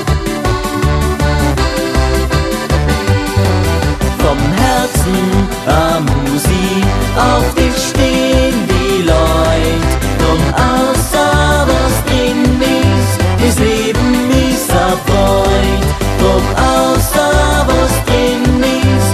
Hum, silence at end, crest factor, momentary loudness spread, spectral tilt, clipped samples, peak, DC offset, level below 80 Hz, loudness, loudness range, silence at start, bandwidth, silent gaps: none; 0 s; 12 dB; 3 LU; -5 dB/octave; under 0.1%; 0 dBFS; under 0.1%; -18 dBFS; -12 LUFS; 2 LU; 0 s; 14 kHz; none